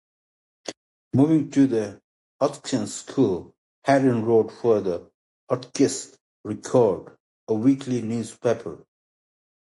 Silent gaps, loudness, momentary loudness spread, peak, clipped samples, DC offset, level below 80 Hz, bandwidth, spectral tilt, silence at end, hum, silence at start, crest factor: 0.77-1.11 s, 2.04-2.39 s, 3.58-3.82 s, 5.14-5.47 s, 6.21-6.44 s, 7.20-7.47 s; -23 LUFS; 15 LU; -4 dBFS; under 0.1%; under 0.1%; -62 dBFS; 11.5 kHz; -6 dB/octave; 0.95 s; none; 0.65 s; 20 dB